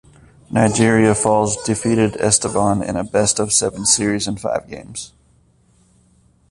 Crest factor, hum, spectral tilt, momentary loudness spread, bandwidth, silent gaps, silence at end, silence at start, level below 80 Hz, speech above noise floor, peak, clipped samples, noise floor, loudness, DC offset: 18 dB; none; -4 dB/octave; 12 LU; 11.5 kHz; none; 1.45 s; 0.5 s; -46 dBFS; 38 dB; 0 dBFS; under 0.1%; -55 dBFS; -17 LUFS; under 0.1%